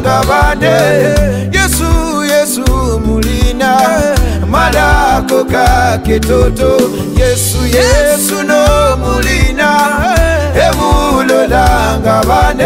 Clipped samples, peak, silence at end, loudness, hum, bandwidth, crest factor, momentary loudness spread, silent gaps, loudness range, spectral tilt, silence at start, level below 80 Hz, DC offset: under 0.1%; 0 dBFS; 0 s; -10 LUFS; none; 16.5 kHz; 10 dB; 4 LU; none; 1 LU; -4.5 dB/octave; 0 s; -16 dBFS; under 0.1%